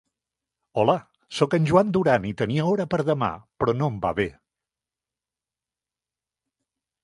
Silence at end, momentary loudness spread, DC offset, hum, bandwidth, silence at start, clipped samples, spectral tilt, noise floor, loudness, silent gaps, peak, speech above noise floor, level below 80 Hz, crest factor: 2.75 s; 9 LU; under 0.1%; none; 11.5 kHz; 0.75 s; under 0.1%; -7 dB/octave; under -90 dBFS; -23 LUFS; none; -4 dBFS; over 68 dB; -54 dBFS; 22 dB